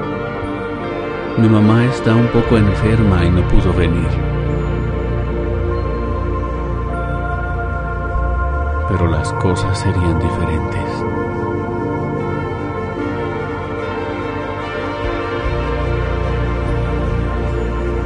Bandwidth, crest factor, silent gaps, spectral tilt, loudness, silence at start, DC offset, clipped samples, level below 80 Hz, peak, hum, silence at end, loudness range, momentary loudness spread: 10 kHz; 16 dB; none; -8 dB/octave; -18 LUFS; 0 s; under 0.1%; under 0.1%; -24 dBFS; 0 dBFS; none; 0 s; 7 LU; 9 LU